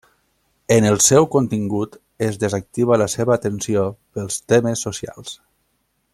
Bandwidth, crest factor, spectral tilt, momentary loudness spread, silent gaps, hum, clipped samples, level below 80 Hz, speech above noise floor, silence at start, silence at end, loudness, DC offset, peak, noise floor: 15.5 kHz; 18 dB; -4.5 dB/octave; 17 LU; none; none; under 0.1%; -54 dBFS; 50 dB; 0.7 s; 0.8 s; -18 LUFS; under 0.1%; -2 dBFS; -68 dBFS